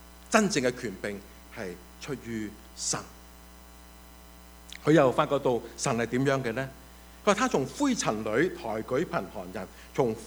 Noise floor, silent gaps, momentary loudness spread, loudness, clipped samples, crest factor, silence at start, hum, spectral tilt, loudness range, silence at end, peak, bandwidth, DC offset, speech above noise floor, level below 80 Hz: -50 dBFS; none; 16 LU; -29 LUFS; under 0.1%; 26 dB; 0 s; none; -4.5 dB/octave; 10 LU; 0 s; -4 dBFS; over 20 kHz; under 0.1%; 22 dB; -54 dBFS